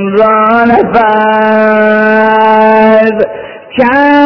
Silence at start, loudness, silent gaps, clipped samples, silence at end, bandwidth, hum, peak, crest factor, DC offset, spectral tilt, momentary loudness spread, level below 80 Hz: 0 s; -7 LUFS; none; 4%; 0 s; 5.4 kHz; none; 0 dBFS; 6 dB; under 0.1%; -8 dB/octave; 6 LU; -42 dBFS